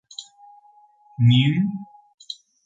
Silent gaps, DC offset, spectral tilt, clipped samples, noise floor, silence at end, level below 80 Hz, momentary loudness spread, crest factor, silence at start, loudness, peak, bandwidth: 2.14-2.18 s; under 0.1%; -6.5 dB/octave; under 0.1%; -54 dBFS; 0.3 s; -58 dBFS; 22 LU; 18 dB; 0.2 s; -19 LUFS; -6 dBFS; 7.8 kHz